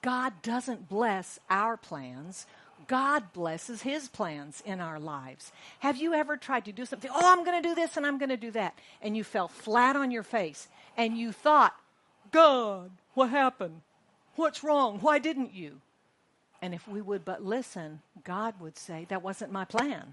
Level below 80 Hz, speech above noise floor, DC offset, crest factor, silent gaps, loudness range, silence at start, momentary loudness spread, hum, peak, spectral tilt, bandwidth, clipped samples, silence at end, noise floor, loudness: -80 dBFS; 40 dB; under 0.1%; 24 dB; none; 9 LU; 0.05 s; 19 LU; none; -6 dBFS; -4.5 dB/octave; 11.5 kHz; under 0.1%; 0 s; -70 dBFS; -29 LUFS